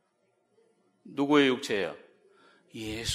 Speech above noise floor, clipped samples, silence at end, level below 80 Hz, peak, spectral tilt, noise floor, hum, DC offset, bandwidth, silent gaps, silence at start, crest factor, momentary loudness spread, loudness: 45 dB; under 0.1%; 0 s; -60 dBFS; -10 dBFS; -4 dB/octave; -73 dBFS; none; under 0.1%; 15 kHz; none; 1.05 s; 20 dB; 21 LU; -27 LUFS